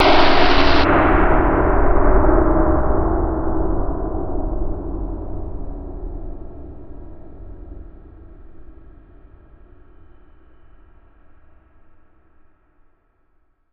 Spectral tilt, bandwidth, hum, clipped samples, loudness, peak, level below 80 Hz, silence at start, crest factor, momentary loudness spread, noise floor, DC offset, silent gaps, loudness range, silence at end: -4.5 dB/octave; 6 kHz; none; under 0.1%; -18 LUFS; 0 dBFS; -24 dBFS; 0 s; 18 dB; 25 LU; -60 dBFS; under 0.1%; none; 25 LU; 5.05 s